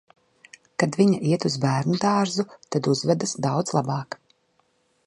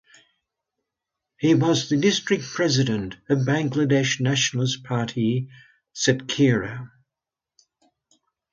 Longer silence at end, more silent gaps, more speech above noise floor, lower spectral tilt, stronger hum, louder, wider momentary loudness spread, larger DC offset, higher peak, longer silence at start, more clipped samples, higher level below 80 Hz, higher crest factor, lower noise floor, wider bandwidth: second, 0.9 s vs 1.65 s; neither; second, 45 dB vs 66 dB; about the same, -5.5 dB/octave vs -5 dB/octave; neither; about the same, -23 LUFS vs -22 LUFS; about the same, 9 LU vs 8 LU; neither; about the same, -6 dBFS vs -6 dBFS; second, 0.8 s vs 1.4 s; neither; second, -66 dBFS vs -58 dBFS; about the same, 18 dB vs 18 dB; second, -67 dBFS vs -88 dBFS; first, 11.5 kHz vs 7.8 kHz